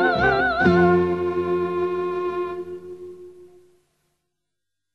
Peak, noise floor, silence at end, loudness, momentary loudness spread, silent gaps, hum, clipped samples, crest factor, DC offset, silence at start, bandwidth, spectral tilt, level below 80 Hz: -6 dBFS; -84 dBFS; 1.5 s; -21 LUFS; 19 LU; none; none; under 0.1%; 18 dB; 0.2%; 0 s; 6.2 kHz; -8 dB/octave; -48 dBFS